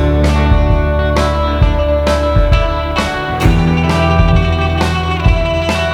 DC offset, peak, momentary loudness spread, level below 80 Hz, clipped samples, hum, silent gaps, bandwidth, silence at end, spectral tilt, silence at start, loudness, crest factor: under 0.1%; 0 dBFS; 3 LU; -16 dBFS; under 0.1%; none; none; 12.5 kHz; 0 s; -6.5 dB/octave; 0 s; -13 LUFS; 12 dB